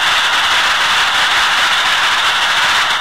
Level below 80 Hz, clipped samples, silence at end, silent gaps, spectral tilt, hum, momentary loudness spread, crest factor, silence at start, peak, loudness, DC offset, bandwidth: -46 dBFS; under 0.1%; 0 s; none; 1 dB/octave; none; 1 LU; 10 dB; 0 s; -2 dBFS; -11 LUFS; 1%; 16 kHz